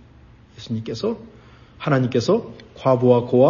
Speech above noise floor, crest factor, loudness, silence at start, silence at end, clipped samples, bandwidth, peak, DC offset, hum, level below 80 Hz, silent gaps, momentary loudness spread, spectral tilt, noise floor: 29 dB; 18 dB; -21 LUFS; 0.6 s; 0 s; under 0.1%; 7.2 kHz; -2 dBFS; under 0.1%; none; -54 dBFS; none; 16 LU; -7.5 dB/octave; -48 dBFS